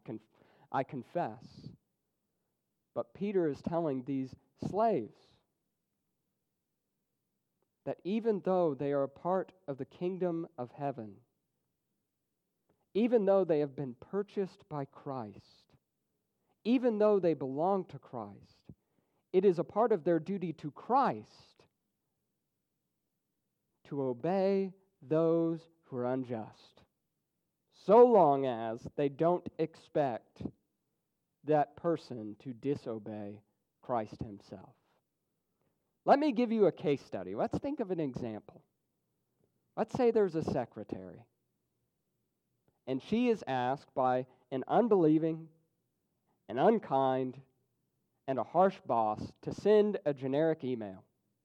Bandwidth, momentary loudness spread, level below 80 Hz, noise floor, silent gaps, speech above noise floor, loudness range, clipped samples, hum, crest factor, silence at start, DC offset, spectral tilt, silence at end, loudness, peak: 8.4 kHz; 17 LU; -72 dBFS; -85 dBFS; none; 53 dB; 10 LU; under 0.1%; none; 22 dB; 0.1 s; under 0.1%; -8.5 dB/octave; 0.45 s; -32 LUFS; -12 dBFS